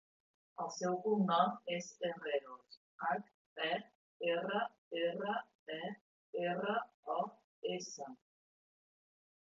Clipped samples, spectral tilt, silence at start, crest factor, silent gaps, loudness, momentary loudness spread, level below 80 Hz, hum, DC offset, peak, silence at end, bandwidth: under 0.1%; -3.5 dB/octave; 0.6 s; 22 dB; 2.77-2.99 s, 3.34-3.56 s, 3.95-4.20 s, 4.78-4.91 s, 5.55-5.66 s, 6.01-6.33 s, 6.94-7.03 s, 7.44-7.62 s; -39 LUFS; 13 LU; under -90 dBFS; none; under 0.1%; -18 dBFS; 1.25 s; 7.4 kHz